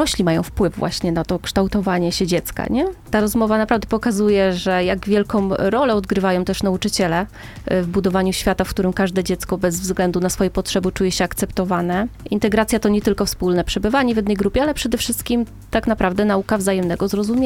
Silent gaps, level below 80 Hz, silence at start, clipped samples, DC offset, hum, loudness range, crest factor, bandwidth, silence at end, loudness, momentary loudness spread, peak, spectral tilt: none; -36 dBFS; 0 s; under 0.1%; under 0.1%; none; 2 LU; 18 dB; 17 kHz; 0 s; -19 LUFS; 4 LU; -2 dBFS; -5 dB/octave